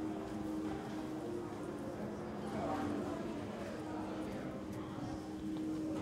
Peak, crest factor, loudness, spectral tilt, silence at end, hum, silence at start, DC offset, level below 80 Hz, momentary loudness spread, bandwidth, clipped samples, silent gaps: -28 dBFS; 14 dB; -42 LUFS; -6.5 dB/octave; 0 s; none; 0 s; under 0.1%; -62 dBFS; 4 LU; 15.5 kHz; under 0.1%; none